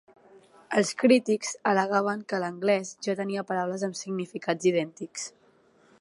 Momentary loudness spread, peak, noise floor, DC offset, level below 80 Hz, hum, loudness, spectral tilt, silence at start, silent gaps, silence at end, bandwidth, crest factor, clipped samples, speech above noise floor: 12 LU; -8 dBFS; -61 dBFS; under 0.1%; -80 dBFS; none; -27 LUFS; -4.5 dB/octave; 0.7 s; none; 0.7 s; 11.5 kHz; 20 dB; under 0.1%; 35 dB